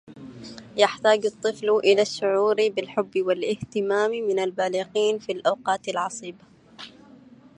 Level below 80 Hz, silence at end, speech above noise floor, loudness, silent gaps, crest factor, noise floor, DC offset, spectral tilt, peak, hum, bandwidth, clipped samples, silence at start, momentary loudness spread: -68 dBFS; 0.7 s; 26 dB; -24 LUFS; none; 22 dB; -50 dBFS; under 0.1%; -3.5 dB/octave; -4 dBFS; none; 10.5 kHz; under 0.1%; 0.1 s; 20 LU